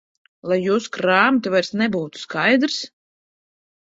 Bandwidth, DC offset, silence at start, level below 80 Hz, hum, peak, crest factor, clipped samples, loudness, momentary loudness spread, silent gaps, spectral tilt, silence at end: 7.8 kHz; under 0.1%; 0.45 s; -64 dBFS; none; 0 dBFS; 20 dB; under 0.1%; -19 LUFS; 11 LU; none; -4.5 dB/octave; 0.95 s